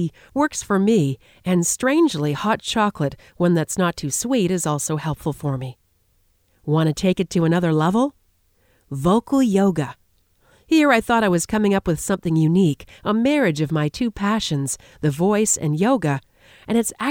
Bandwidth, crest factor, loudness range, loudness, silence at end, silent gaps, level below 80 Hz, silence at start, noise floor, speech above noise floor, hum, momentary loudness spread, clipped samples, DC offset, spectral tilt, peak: 18.5 kHz; 16 dB; 3 LU; -20 LUFS; 0 s; none; -50 dBFS; 0 s; -62 dBFS; 43 dB; none; 8 LU; under 0.1%; under 0.1%; -5.5 dB/octave; -4 dBFS